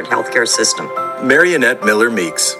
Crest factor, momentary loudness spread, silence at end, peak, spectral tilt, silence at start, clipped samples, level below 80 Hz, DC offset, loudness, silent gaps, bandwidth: 14 dB; 8 LU; 0 s; 0 dBFS; -2 dB/octave; 0 s; under 0.1%; -62 dBFS; under 0.1%; -13 LUFS; none; 16 kHz